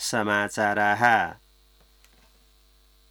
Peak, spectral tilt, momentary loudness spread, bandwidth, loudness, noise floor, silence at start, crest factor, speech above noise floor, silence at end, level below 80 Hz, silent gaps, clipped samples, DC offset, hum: -6 dBFS; -3.5 dB/octave; 5 LU; over 20 kHz; -23 LUFS; -59 dBFS; 0 s; 20 dB; 36 dB; 1.75 s; -60 dBFS; none; under 0.1%; under 0.1%; none